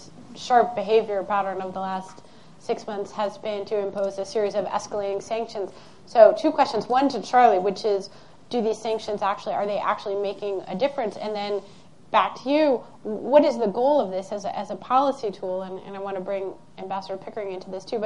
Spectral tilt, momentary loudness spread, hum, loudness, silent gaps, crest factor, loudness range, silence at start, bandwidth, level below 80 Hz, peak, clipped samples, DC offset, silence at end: -5 dB/octave; 14 LU; none; -24 LUFS; none; 24 dB; 7 LU; 0 s; 10.5 kHz; -66 dBFS; -2 dBFS; under 0.1%; 0.4%; 0 s